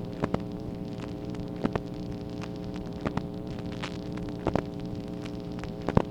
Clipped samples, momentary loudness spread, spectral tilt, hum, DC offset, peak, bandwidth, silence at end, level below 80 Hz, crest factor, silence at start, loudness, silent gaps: under 0.1%; 6 LU; -7.5 dB/octave; none; under 0.1%; -4 dBFS; 15 kHz; 0 s; -46 dBFS; 30 dB; 0 s; -34 LUFS; none